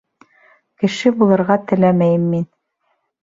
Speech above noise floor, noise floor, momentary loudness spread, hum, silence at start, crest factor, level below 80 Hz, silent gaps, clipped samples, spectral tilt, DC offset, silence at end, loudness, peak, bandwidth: 53 dB; -68 dBFS; 8 LU; none; 0.8 s; 16 dB; -58 dBFS; none; under 0.1%; -7.5 dB/octave; under 0.1%; 0.75 s; -16 LUFS; -2 dBFS; 7.8 kHz